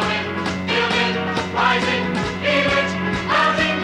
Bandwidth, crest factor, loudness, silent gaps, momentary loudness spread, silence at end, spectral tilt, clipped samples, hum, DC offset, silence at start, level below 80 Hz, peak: 11 kHz; 16 dB; -19 LUFS; none; 5 LU; 0 s; -4.5 dB/octave; under 0.1%; none; under 0.1%; 0 s; -44 dBFS; -4 dBFS